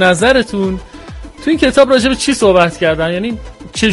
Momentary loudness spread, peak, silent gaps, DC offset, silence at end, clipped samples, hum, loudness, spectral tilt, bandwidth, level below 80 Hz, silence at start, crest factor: 17 LU; 0 dBFS; none; under 0.1%; 0 s; under 0.1%; none; -12 LUFS; -4.5 dB/octave; 11.5 kHz; -32 dBFS; 0 s; 12 dB